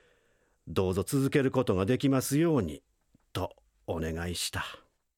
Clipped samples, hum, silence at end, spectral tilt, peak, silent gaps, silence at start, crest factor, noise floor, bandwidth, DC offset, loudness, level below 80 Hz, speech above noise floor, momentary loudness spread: under 0.1%; none; 0.4 s; -5.5 dB/octave; -14 dBFS; none; 0.65 s; 18 dB; -70 dBFS; 17 kHz; under 0.1%; -30 LUFS; -54 dBFS; 41 dB; 13 LU